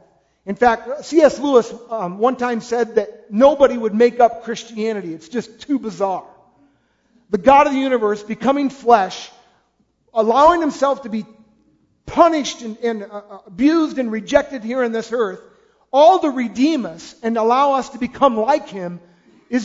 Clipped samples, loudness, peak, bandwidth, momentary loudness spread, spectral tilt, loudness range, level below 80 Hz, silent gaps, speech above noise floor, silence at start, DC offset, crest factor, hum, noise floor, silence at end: under 0.1%; -17 LUFS; 0 dBFS; 7.8 kHz; 15 LU; -5 dB/octave; 4 LU; -52 dBFS; none; 46 dB; 0.45 s; under 0.1%; 18 dB; none; -63 dBFS; 0 s